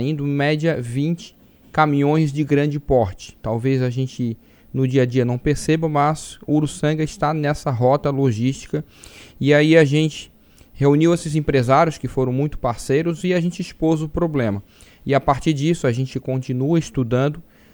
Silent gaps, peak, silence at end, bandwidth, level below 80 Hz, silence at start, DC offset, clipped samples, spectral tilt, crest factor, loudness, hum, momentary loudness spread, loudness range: none; 0 dBFS; 0.35 s; over 20 kHz; -42 dBFS; 0 s; under 0.1%; under 0.1%; -7 dB/octave; 20 dB; -20 LUFS; none; 9 LU; 3 LU